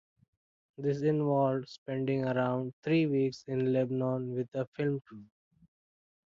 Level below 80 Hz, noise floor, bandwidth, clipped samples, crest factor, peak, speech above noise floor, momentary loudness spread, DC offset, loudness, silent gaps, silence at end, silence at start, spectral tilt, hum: -74 dBFS; under -90 dBFS; 7.4 kHz; under 0.1%; 16 dB; -18 dBFS; over 59 dB; 8 LU; under 0.1%; -32 LUFS; 1.78-1.86 s, 2.73-2.83 s, 4.67-4.72 s; 1.1 s; 0.8 s; -8.5 dB/octave; none